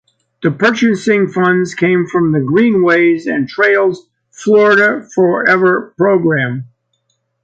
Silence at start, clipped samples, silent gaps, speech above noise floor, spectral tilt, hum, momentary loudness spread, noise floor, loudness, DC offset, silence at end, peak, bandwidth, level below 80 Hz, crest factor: 0.4 s; under 0.1%; none; 53 dB; -6.5 dB/octave; none; 8 LU; -65 dBFS; -12 LUFS; under 0.1%; 0.8 s; 0 dBFS; 8.8 kHz; -58 dBFS; 12 dB